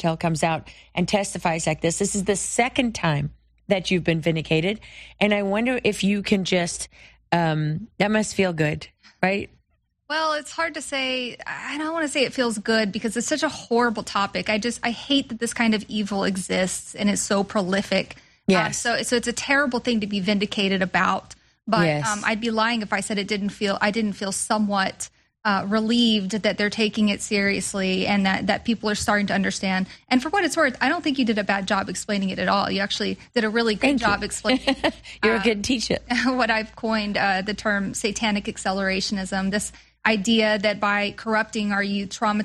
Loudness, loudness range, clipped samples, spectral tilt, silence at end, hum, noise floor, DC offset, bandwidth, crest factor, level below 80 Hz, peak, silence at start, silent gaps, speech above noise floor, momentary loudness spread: -23 LUFS; 2 LU; under 0.1%; -4 dB/octave; 0 s; none; -68 dBFS; under 0.1%; 13 kHz; 20 dB; -52 dBFS; -4 dBFS; 0 s; none; 45 dB; 6 LU